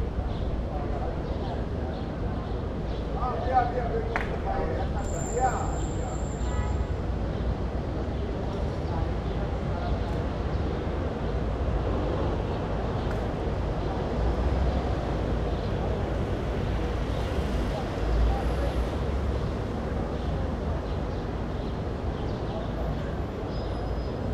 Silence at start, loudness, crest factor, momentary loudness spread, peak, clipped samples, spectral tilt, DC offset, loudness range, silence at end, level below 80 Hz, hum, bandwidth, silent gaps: 0 s; -30 LUFS; 18 dB; 5 LU; -10 dBFS; under 0.1%; -7 dB/octave; under 0.1%; 3 LU; 0 s; -32 dBFS; none; 8.4 kHz; none